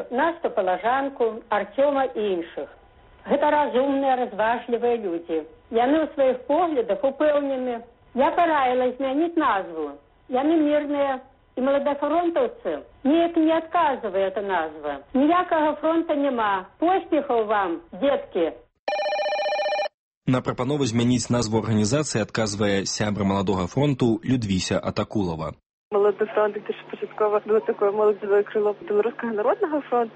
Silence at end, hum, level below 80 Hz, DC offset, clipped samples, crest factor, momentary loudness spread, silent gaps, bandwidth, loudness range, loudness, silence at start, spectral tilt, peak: 0.05 s; none; -56 dBFS; under 0.1%; under 0.1%; 14 dB; 8 LU; 18.79-18.87 s, 19.94-20.21 s, 25.66-25.91 s; 8.4 kHz; 2 LU; -23 LUFS; 0 s; -5.5 dB/octave; -8 dBFS